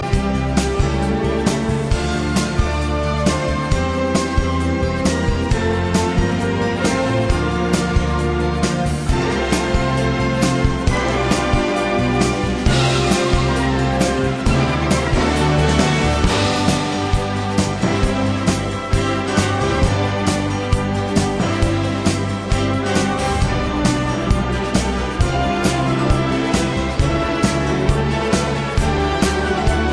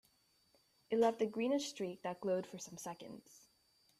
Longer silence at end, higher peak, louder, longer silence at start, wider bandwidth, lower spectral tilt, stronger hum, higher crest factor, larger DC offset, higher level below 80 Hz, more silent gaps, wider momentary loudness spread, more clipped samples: second, 0 s vs 0.6 s; first, 0 dBFS vs -22 dBFS; first, -18 LUFS vs -39 LUFS; second, 0 s vs 0.9 s; second, 11 kHz vs 15 kHz; about the same, -5.5 dB/octave vs -4.5 dB/octave; neither; about the same, 16 dB vs 20 dB; neither; first, -24 dBFS vs -84 dBFS; neither; second, 3 LU vs 16 LU; neither